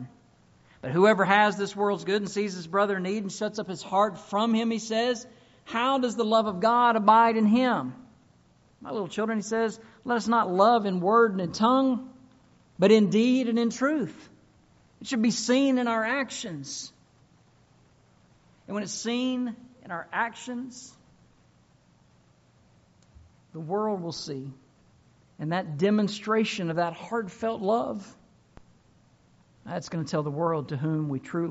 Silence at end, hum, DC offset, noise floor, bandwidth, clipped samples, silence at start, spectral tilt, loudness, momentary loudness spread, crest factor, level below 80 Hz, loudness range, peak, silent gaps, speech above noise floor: 0 s; none; under 0.1%; -61 dBFS; 8 kHz; under 0.1%; 0 s; -4.5 dB/octave; -26 LUFS; 16 LU; 22 dB; -68 dBFS; 12 LU; -6 dBFS; none; 36 dB